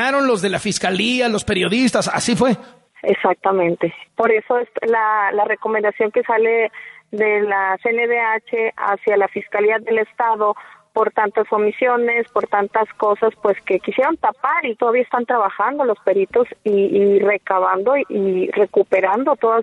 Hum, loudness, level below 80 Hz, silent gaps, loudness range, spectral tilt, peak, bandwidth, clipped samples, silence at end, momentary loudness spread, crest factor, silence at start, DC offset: none; -18 LUFS; -56 dBFS; none; 1 LU; -4.5 dB/octave; -2 dBFS; 11.5 kHz; under 0.1%; 0 s; 4 LU; 16 dB; 0 s; under 0.1%